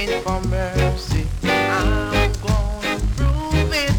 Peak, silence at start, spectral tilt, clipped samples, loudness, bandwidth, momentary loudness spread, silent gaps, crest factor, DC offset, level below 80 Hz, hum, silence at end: -6 dBFS; 0 s; -5.5 dB/octave; under 0.1%; -20 LUFS; 19.5 kHz; 4 LU; none; 14 dB; under 0.1%; -24 dBFS; none; 0 s